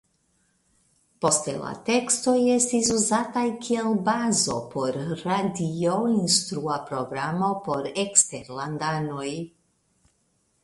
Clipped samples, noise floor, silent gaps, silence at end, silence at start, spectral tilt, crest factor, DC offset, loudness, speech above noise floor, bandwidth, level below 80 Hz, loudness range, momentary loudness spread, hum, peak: under 0.1%; -69 dBFS; none; 1.15 s; 1.2 s; -3.5 dB/octave; 24 dB; under 0.1%; -24 LUFS; 45 dB; 11.5 kHz; -62 dBFS; 3 LU; 10 LU; none; 0 dBFS